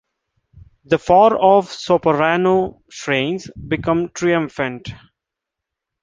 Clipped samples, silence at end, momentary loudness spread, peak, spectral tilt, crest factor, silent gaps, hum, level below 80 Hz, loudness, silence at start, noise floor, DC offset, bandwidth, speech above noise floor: under 0.1%; 1.1 s; 14 LU; -2 dBFS; -5.5 dB/octave; 16 dB; none; none; -48 dBFS; -17 LUFS; 0.9 s; -83 dBFS; under 0.1%; 9.6 kHz; 66 dB